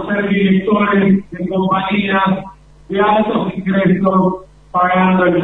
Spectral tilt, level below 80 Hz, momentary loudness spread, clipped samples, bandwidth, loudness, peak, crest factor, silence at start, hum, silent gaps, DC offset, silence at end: -9 dB/octave; -46 dBFS; 7 LU; under 0.1%; 4 kHz; -15 LUFS; 0 dBFS; 14 dB; 0 s; none; none; under 0.1%; 0 s